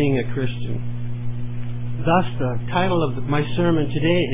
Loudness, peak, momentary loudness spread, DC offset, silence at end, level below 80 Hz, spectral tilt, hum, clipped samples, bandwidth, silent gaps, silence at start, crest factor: -23 LUFS; -4 dBFS; 10 LU; under 0.1%; 0 s; -42 dBFS; -11 dB/octave; 60 Hz at -30 dBFS; under 0.1%; 3.8 kHz; none; 0 s; 16 dB